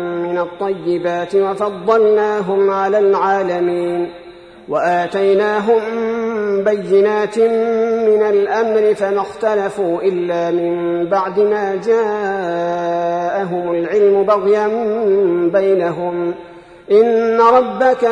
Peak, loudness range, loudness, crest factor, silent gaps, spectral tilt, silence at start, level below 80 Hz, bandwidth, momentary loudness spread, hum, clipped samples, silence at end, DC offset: 0 dBFS; 2 LU; -15 LUFS; 14 dB; none; -6.5 dB/octave; 0 s; -58 dBFS; 10 kHz; 7 LU; none; under 0.1%; 0 s; under 0.1%